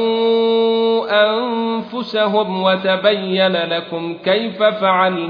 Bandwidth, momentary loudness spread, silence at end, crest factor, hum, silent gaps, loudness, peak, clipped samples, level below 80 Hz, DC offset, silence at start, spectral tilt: 5.2 kHz; 7 LU; 0 s; 16 dB; none; none; -16 LUFS; -2 dBFS; under 0.1%; -66 dBFS; under 0.1%; 0 s; -7.5 dB/octave